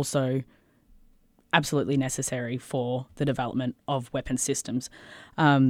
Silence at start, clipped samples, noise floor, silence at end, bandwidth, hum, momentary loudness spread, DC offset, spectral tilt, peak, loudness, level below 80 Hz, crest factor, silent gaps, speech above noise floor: 0 s; under 0.1%; -60 dBFS; 0 s; 16 kHz; none; 9 LU; under 0.1%; -5 dB/octave; -4 dBFS; -28 LUFS; -54 dBFS; 22 dB; none; 33 dB